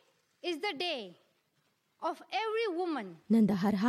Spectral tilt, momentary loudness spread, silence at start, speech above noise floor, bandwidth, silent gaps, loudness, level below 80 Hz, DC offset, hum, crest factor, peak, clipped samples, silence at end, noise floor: -6.5 dB/octave; 12 LU; 0.45 s; 44 dB; 13 kHz; none; -33 LUFS; -74 dBFS; under 0.1%; none; 16 dB; -18 dBFS; under 0.1%; 0 s; -76 dBFS